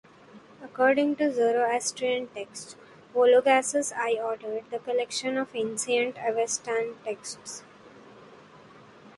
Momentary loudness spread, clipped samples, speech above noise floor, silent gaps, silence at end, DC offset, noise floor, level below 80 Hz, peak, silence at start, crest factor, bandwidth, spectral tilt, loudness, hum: 17 LU; under 0.1%; 25 dB; none; 0.05 s; under 0.1%; -52 dBFS; -76 dBFS; -8 dBFS; 0.35 s; 20 dB; 11.5 kHz; -2.5 dB/octave; -26 LUFS; none